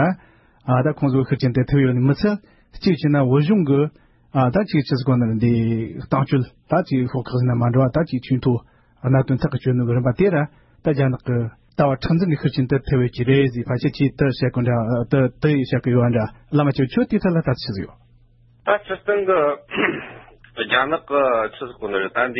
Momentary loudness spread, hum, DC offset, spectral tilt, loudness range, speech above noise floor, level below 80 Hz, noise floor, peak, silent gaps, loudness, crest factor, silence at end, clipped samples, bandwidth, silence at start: 8 LU; none; under 0.1%; -10.5 dB/octave; 2 LU; 34 dB; -46 dBFS; -53 dBFS; -4 dBFS; none; -20 LUFS; 16 dB; 0 s; under 0.1%; 5.8 kHz; 0 s